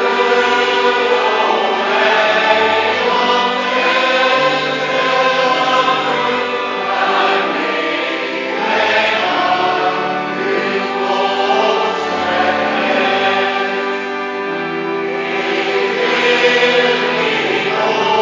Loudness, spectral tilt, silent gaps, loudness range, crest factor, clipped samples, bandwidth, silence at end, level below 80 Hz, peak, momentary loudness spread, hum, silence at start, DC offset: -14 LUFS; -3.5 dB/octave; none; 3 LU; 14 dB; under 0.1%; 7.6 kHz; 0 s; -60 dBFS; 0 dBFS; 6 LU; none; 0 s; under 0.1%